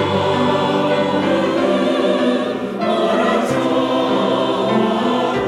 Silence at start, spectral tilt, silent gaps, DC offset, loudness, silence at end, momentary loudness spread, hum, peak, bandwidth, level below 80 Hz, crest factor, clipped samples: 0 s; -6 dB/octave; none; under 0.1%; -17 LUFS; 0 s; 2 LU; none; -4 dBFS; 13.5 kHz; -54 dBFS; 12 dB; under 0.1%